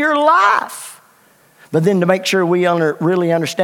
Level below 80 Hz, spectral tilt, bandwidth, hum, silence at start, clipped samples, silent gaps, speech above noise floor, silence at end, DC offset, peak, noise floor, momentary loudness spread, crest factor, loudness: -70 dBFS; -5.5 dB/octave; 17.5 kHz; none; 0 s; under 0.1%; none; 37 dB; 0 s; under 0.1%; 0 dBFS; -51 dBFS; 12 LU; 16 dB; -15 LUFS